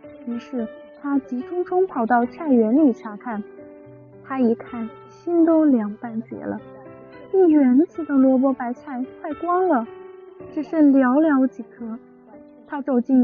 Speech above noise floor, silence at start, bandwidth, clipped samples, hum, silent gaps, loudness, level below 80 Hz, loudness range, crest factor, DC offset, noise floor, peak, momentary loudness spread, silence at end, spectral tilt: 26 dB; 0.05 s; 4.9 kHz; under 0.1%; none; none; -20 LUFS; -66 dBFS; 3 LU; 14 dB; under 0.1%; -46 dBFS; -8 dBFS; 18 LU; 0 s; -7 dB/octave